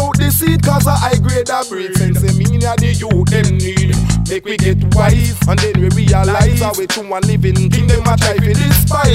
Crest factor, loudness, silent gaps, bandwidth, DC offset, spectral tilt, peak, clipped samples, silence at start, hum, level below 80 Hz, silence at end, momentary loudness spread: 12 dB; -13 LUFS; none; 16.5 kHz; under 0.1%; -5.5 dB/octave; 0 dBFS; under 0.1%; 0 s; none; -22 dBFS; 0 s; 5 LU